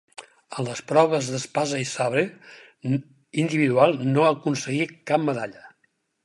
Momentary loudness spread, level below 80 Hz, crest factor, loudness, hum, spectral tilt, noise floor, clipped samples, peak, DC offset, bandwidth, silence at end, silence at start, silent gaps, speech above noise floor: 12 LU; -72 dBFS; 20 dB; -23 LUFS; none; -5.5 dB/octave; -70 dBFS; under 0.1%; -4 dBFS; under 0.1%; 11.5 kHz; 0.55 s; 0.2 s; none; 47 dB